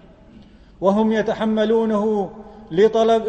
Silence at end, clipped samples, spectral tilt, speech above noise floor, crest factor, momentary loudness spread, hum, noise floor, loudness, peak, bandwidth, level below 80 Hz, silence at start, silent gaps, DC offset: 0 s; under 0.1%; -7 dB/octave; 28 dB; 16 dB; 8 LU; none; -46 dBFS; -19 LUFS; -4 dBFS; 8.4 kHz; -50 dBFS; 0.8 s; none; under 0.1%